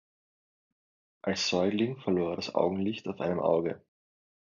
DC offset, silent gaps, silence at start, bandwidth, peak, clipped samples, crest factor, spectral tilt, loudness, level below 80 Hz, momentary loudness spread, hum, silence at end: under 0.1%; none; 1.25 s; 7.6 kHz; -10 dBFS; under 0.1%; 22 dB; -5 dB/octave; -30 LUFS; -62 dBFS; 7 LU; none; 0.75 s